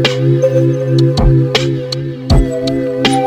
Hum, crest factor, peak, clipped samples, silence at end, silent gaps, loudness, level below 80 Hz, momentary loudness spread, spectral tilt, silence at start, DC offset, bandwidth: none; 10 dB; -2 dBFS; under 0.1%; 0 s; none; -13 LUFS; -22 dBFS; 6 LU; -6.5 dB/octave; 0 s; under 0.1%; 10 kHz